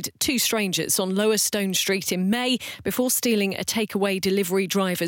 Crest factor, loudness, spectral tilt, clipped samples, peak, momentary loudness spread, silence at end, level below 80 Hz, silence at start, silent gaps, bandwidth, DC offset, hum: 14 dB; -23 LUFS; -3 dB/octave; under 0.1%; -10 dBFS; 4 LU; 0 s; -60 dBFS; 0 s; none; 17 kHz; under 0.1%; none